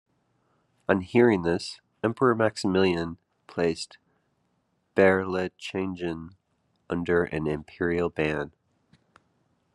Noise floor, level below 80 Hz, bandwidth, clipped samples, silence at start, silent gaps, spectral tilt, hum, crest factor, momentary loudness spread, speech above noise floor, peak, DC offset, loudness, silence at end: -73 dBFS; -60 dBFS; 11.5 kHz; under 0.1%; 0.9 s; none; -6.5 dB/octave; none; 22 dB; 16 LU; 47 dB; -4 dBFS; under 0.1%; -26 LUFS; 1.25 s